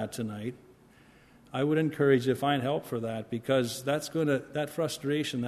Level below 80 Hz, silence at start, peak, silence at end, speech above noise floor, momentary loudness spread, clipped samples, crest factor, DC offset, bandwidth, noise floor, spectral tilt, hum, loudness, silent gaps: -68 dBFS; 0 s; -12 dBFS; 0 s; 29 dB; 10 LU; under 0.1%; 18 dB; under 0.1%; 13.5 kHz; -58 dBFS; -5.5 dB/octave; none; -30 LUFS; none